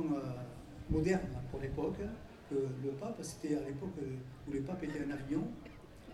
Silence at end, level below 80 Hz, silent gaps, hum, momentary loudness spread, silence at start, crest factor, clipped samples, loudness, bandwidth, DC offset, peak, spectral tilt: 0 s; -54 dBFS; none; none; 12 LU; 0 s; 18 dB; under 0.1%; -40 LUFS; 13.5 kHz; under 0.1%; -20 dBFS; -7 dB/octave